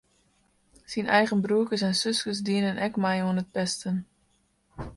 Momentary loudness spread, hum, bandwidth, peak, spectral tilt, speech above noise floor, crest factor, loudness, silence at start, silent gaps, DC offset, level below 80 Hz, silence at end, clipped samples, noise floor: 9 LU; none; 11.5 kHz; -8 dBFS; -4.5 dB/octave; 42 dB; 20 dB; -26 LUFS; 0.9 s; none; under 0.1%; -58 dBFS; 0 s; under 0.1%; -68 dBFS